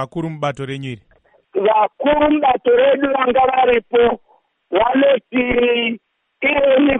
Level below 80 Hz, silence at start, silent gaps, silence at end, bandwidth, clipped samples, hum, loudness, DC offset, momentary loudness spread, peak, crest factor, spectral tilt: -44 dBFS; 0 s; none; 0 s; 8.4 kHz; under 0.1%; none; -16 LUFS; under 0.1%; 13 LU; -4 dBFS; 12 dB; -7 dB/octave